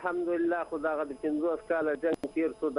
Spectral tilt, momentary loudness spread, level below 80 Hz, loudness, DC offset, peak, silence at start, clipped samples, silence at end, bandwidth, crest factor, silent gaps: -6.5 dB/octave; 3 LU; -64 dBFS; -31 LUFS; under 0.1%; -16 dBFS; 0 s; under 0.1%; 0 s; 10.5 kHz; 14 dB; none